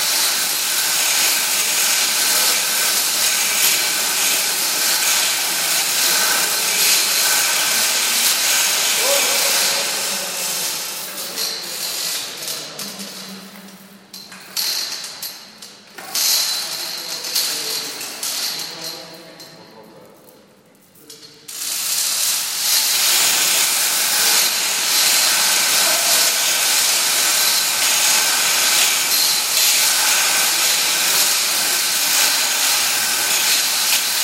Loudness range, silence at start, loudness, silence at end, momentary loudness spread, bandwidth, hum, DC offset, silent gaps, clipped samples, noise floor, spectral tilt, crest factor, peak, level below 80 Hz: 12 LU; 0 s; -15 LUFS; 0 s; 12 LU; 16.5 kHz; none; under 0.1%; none; under 0.1%; -50 dBFS; 2 dB/octave; 18 dB; 0 dBFS; -74 dBFS